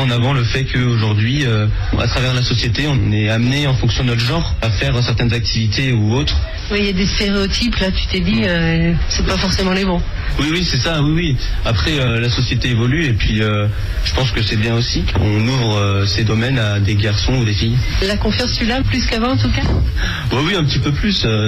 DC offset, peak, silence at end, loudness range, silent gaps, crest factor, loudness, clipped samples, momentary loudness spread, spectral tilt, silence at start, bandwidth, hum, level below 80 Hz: under 0.1%; -6 dBFS; 0 s; 1 LU; none; 10 dB; -16 LUFS; under 0.1%; 3 LU; -5.5 dB/octave; 0 s; 11.5 kHz; none; -24 dBFS